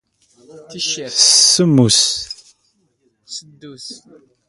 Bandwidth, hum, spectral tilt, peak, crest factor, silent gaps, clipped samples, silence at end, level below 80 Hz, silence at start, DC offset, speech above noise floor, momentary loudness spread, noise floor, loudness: 11.5 kHz; none; -3 dB/octave; 0 dBFS; 18 dB; none; under 0.1%; 0.5 s; -56 dBFS; 0.55 s; under 0.1%; 47 dB; 25 LU; -63 dBFS; -12 LUFS